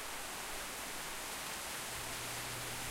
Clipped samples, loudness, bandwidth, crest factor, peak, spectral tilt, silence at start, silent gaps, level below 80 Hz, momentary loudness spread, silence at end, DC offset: under 0.1%; -41 LUFS; 16 kHz; 14 dB; -30 dBFS; -1.5 dB/octave; 0 s; none; -60 dBFS; 1 LU; 0 s; under 0.1%